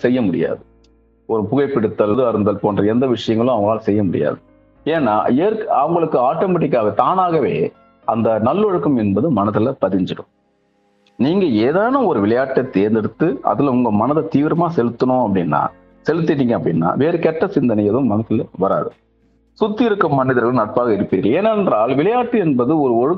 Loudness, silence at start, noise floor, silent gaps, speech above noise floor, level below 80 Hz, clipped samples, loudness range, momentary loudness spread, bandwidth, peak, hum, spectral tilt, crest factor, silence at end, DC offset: -17 LUFS; 0 s; -61 dBFS; none; 45 dB; -54 dBFS; under 0.1%; 2 LU; 6 LU; 7 kHz; 0 dBFS; none; -9 dB/octave; 16 dB; 0 s; under 0.1%